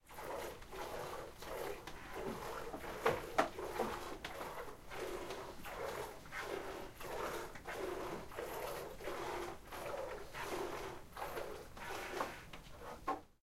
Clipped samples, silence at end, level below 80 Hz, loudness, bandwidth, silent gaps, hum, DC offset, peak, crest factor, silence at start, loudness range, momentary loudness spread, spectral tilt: under 0.1%; 0.15 s; -58 dBFS; -45 LUFS; 16 kHz; none; none; under 0.1%; -18 dBFS; 26 dB; 0.05 s; 4 LU; 9 LU; -4 dB/octave